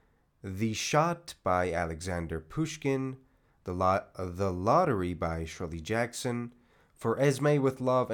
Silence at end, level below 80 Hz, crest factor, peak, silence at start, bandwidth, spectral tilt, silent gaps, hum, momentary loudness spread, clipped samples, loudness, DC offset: 0 s; -56 dBFS; 18 dB; -12 dBFS; 0.45 s; 19 kHz; -5.5 dB/octave; none; none; 13 LU; under 0.1%; -30 LUFS; under 0.1%